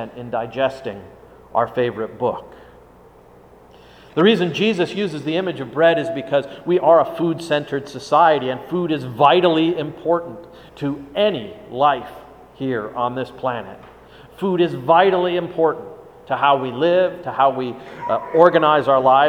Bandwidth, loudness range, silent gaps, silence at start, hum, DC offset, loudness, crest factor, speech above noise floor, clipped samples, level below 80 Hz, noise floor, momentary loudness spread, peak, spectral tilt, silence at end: 13 kHz; 6 LU; none; 0 s; none; under 0.1%; -19 LUFS; 20 dB; 28 dB; under 0.1%; -56 dBFS; -47 dBFS; 13 LU; 0 dBFS; -6.5 dB/octave; 0 s